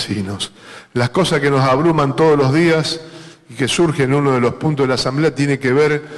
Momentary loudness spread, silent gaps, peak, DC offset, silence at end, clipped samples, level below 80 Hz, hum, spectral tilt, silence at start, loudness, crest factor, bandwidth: 11 LU; none; -6 dBFS; under 0.1%; 0 s; under 0.1%; -48 dBFS; none; -5.5 dB/octave; 0 s; -16 LUFS; 10 dB; 12.5 kHz